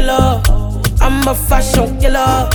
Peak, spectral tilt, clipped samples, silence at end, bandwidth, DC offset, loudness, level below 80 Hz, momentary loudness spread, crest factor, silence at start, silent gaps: 0 dBFS; -5 dB/octave; under 0.1%; 0 s; 19.5 kHz; under 0.1%; -14 LUFS; -14 dBFS; 4 LU; 10 dB; 0 s; none